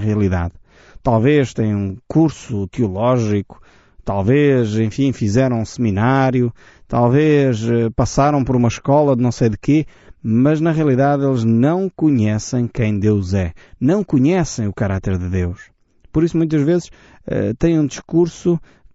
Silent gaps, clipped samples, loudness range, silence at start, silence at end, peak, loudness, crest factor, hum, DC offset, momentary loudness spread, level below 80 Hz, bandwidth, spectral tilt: none; under 0.1%; 3 LU; 0 s; 0.3 s; -2 dBFS; -17 LUFS; 14 dB; none; under 0.1%; 8 LU; -40 dBFS; 8 kHz; -8 dB/octave